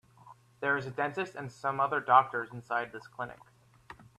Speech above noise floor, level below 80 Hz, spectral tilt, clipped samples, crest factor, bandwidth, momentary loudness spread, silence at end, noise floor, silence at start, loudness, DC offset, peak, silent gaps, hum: 26 dB; -72 dBFS; -6 dB/octave; under 0.1%; 24 dB; 12.5 kHz; 17 LU; 0.15 s; -57 dBFS; 0.25 s; -31 LUFS; under 0.1%; -8 dBFS; none; none